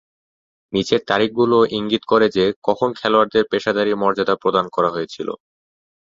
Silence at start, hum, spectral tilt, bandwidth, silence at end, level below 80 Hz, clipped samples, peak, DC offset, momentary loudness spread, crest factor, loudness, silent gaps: 0.7 s; none; -5.5 dB/octave; 7.6 kHz; 0.75 s; -58 dBFS; under 0.1%; -2 dBFS; under 0.1%; 9 LU; 18 dB; -18 LUFS; 2.56-2.62 s